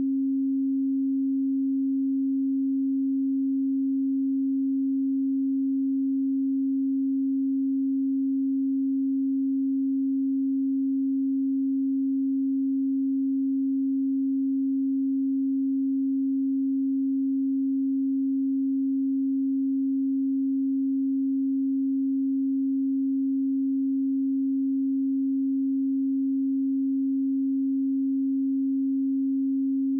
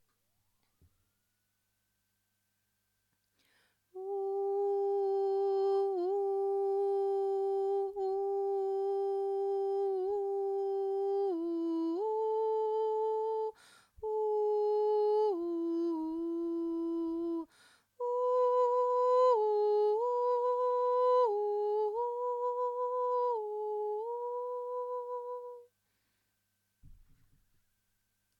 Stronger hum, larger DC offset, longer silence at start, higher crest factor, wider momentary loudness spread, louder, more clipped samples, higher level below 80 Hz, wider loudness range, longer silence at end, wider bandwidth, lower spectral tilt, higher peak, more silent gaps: neither; neither; second, 0 s vs 3.95 s; second, 4 dB vs 14 dB; second, 0 LU vs 9 LU; first, -26 LUFS vs -33 LUFS; neither; second, under -90 dBFS vs -76 dBFS; second, 0 LU vs 10 LU; second, 0 s vs 1.45 s; second, 0.3 kHz vs 7.2 kHz; first, -16.5 dB/octave vs -6 dB/octave; about the same, -22 dBFS vs -20 dBFS; neither